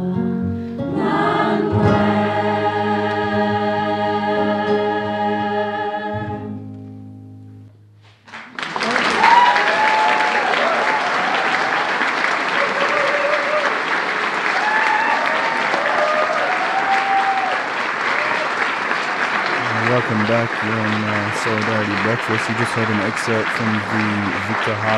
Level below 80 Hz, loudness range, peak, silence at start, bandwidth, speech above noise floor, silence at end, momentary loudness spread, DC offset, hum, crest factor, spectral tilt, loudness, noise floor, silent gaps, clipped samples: -54 dBFS; 6 LU; -2 dBFS; 0 s; 12.5 kHz; 28 dB; 0 s; 7 LU; under 0.1%; none; 16 dB; -5 dB/octave; -18 LUFS; -47 dBFS; none; under 0.1%